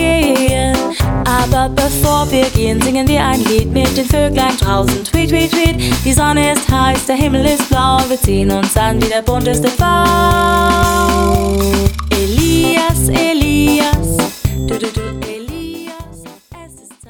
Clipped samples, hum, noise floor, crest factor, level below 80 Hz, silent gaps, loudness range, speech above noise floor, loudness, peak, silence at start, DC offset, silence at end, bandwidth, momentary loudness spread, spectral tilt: under 0.1%; none; -37 dBFS; 12 dB; -22 dBFS; none; 2 LU; 25 dB; -13 LUFS; 0 dBFS; 0 s; under 0.1%; 0.35 s; over 20 kHz; 7 LU; -5 dB/octave